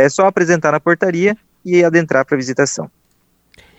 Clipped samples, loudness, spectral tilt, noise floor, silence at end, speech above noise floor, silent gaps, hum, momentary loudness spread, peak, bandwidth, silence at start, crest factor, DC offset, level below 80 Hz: under 0.1%; -14 LUFS; -5.5 dB/octave; -60 dBFS; 0.9 s; 46 dB; none; none; 7 LU; 0 dBFS; 8.4 kHz; 0 s; 16 dB; under 0.1%; -60 dBFS